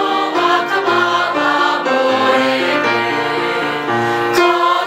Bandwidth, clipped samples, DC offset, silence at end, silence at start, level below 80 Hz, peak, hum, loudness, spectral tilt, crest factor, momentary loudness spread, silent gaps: 16 kHz; under 0.1%; under 0.1%; 0 s; 0 s; -62 dBFS; 0 dBFS; none; -14 LUFS; -4 dB/octave; 14 dB; 4 LU; none